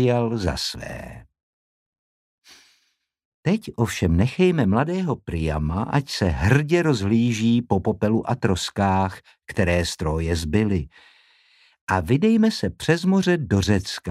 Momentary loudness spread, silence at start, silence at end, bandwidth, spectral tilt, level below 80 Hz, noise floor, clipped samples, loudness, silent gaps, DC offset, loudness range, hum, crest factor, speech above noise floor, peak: 9 LU; 0 s; 0 s; 14.5 kHz; -6 dB/octave; -42 dBFS; -69 dBFS; under 0.1%; -22 LUFS; 1.43-1.93 s, 1.99-2.38 s, 3.25-3.43 s, 11.81-11.87 s; under 0.1%; 7 LU; none; 18 dB; 48 dB; -4 dBFS